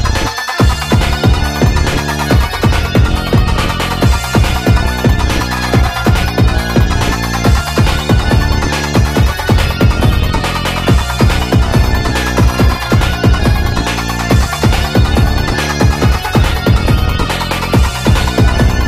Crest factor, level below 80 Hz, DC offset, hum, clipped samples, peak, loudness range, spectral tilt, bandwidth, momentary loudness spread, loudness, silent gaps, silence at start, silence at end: 10 dB; -16 dBFS; under 0.1%; none; under 0.1%; 0 dBFS; 0 LU; -5.5 dB/octave; 16 kHz; 3 LU; -12 LUFS; none; 0 s; 0 s